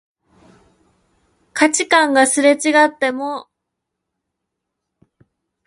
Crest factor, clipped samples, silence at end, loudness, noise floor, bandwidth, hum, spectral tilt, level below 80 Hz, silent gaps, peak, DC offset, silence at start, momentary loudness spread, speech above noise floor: 20 dB; under 0.1%; 2.25 s; -15 LUFS; -78 dBFS; 11.5 kHz; none; -1 dB/octave; -68 dBFS; none; 0 dBFS; under 0.1%; 1.55 s; 14 LU; 64 dB